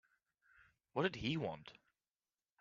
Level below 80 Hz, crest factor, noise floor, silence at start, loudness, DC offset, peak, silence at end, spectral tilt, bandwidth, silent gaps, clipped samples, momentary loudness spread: -72 dBFS; 24 dB; under -90 dBFS; 0.95 s; -41 LUFS; under 0.1%; -22 dBFS; 0.9 s; -4 dB/octave; 7.4 kHz; none; under 0.1%; 15 LU